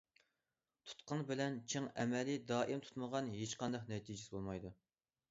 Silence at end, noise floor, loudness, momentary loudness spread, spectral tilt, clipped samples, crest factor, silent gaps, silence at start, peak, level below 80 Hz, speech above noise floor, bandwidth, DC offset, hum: 0.55 s; under -90 dBFS; -43 LUFS; 10 LU; -5 dB/octave; under 0.1%; 18 dB; none; 0.85 s; -24 dBFS; -72 dBFS; over 48 dB; 7.6 kHz; under 0.1%; none